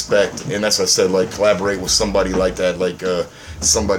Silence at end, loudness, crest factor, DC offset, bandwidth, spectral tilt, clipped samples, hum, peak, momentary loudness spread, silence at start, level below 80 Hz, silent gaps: 0 s; -17 LUFS; 16 dB; under 0.1%; 17 kHz; -2.5 dB/octave; under 0.1%; none; -2 dBFS; 7 LU; 0 s; -36 dBFS; none